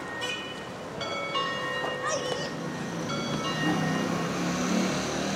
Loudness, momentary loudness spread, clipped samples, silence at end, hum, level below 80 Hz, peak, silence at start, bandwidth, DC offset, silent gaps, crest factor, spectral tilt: -30 LUFS; 7 LU; under 0.1%; 0 s; none; -58 dBFS; -14 dBFS; 0 s; 16.5 kHz; under 0.1%; none; 16 dB; -4 dB/octave